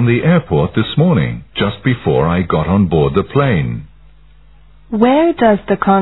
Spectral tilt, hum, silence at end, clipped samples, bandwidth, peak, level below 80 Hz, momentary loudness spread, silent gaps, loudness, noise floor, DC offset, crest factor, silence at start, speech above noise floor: -11 dB/octave; none; 0 s; under 0.1%; 4.1 kHz; 0 dBFS; -36 dBFS; 7 LU; none; -14 LUFS; -45 dBFS; 0.7%; 14 dB; 0 s; 32 dB